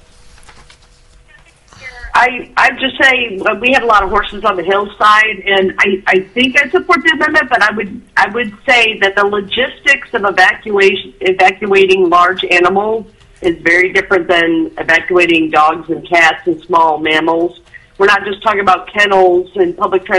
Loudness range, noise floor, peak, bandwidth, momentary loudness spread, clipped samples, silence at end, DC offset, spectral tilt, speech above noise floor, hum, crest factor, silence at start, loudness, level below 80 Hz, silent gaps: 2 LU; -44 dBFS; 0 dBFS; 11.5 kHz; 7 LU; under 0.1%; 0 s; under 0.1%; -4 dB/octave; 33 dB; none; 12 dB; 1.8 s; -11 LUFS; -42 dBFS; none